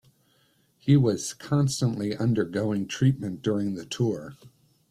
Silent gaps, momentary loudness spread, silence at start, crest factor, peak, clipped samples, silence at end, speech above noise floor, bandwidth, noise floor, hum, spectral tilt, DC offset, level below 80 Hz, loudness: none; 10 LU; 0.85 s; 18 dB; -10 dBFS; under 0.1%; 0.45 s; 40 dB; 13 kHz; -66 dBFS; none; -6.5 dB/octave; under 0.1%; -62 dBFS; -26 LUFS